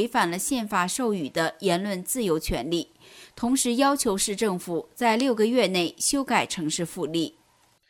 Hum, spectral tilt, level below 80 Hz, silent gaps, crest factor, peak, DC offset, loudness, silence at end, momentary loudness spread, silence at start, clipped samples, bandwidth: none; -3.5 dB/octave; -48 dBFS; none; 18 dB; -6 dBFS; under 0.1%; -25 LUFS; 0.6 s; 8 LU; 0 s; under 0.1%; 18 kHz